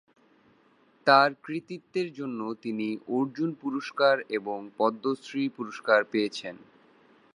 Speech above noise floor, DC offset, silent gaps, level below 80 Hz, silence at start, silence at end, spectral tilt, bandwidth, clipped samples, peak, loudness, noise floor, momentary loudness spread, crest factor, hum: 35 dB; under 0.1%; none; -82 dBFS; 1.05 s; 0.75 s; -5.5 dB/octave; 10.5 kHz; under 0.1%; -6 dBFS; -28 LUFS; -63 dBFS; 14 LU; 24 dB; none